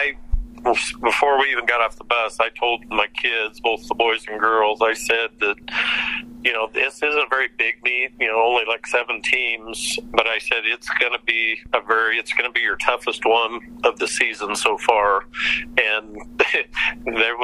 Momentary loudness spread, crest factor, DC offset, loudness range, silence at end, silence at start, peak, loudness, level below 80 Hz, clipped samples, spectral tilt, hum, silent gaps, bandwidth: 5 LU; 20 dB; under 0.1%; 1 LU; 0 s; 0 s; 0 dBFS; -20 LUFS; -40 dBFS; under 0.1%; -2 dB/octave; none; none; 13 kHz